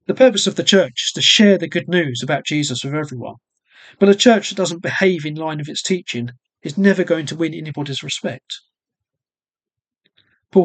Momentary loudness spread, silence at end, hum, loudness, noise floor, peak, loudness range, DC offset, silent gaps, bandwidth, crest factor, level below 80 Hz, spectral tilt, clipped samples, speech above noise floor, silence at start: 15 LU; 0 s; none; -17 LUFS; under -90 dBFS; 0 dBFS; 7 LU; under 0.1%; none; 9.2 kHz; 18 dB; -66 dBFS; -4 dB/octave; under 0.1%; over 73 dB; 0.1 s